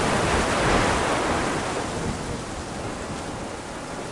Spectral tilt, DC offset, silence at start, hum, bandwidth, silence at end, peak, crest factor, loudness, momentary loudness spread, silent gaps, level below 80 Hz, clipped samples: -4 dB/octave; under 0.1%; 0 s; none; 11.5 kHz; 0 s; -10 dBFS; 16 dB; -25 LUFS; 12 LU; none; -38 dBFS; under 0.1%